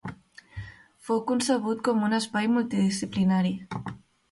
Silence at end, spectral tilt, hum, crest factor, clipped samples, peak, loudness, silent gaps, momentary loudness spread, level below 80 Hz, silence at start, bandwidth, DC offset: 0.35 s; -5.5 dB/octave; none; 16 dB; under 0.1%; -12 dBFS; -26 LUFS; none; 18 LU; -58 dBFS; 0.05 s; 11.5 kHz; under 0.1%